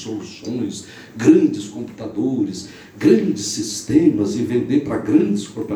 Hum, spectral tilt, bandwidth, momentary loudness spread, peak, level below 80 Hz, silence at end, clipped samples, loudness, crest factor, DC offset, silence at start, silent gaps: none; -5.5 dB/octave; 13 kHz; 15 LU; 0 dBFS; -54 dBFS; 0 s; under 0.1%; -19 LUFS; 18 dB; under 0.1%; 0 s; none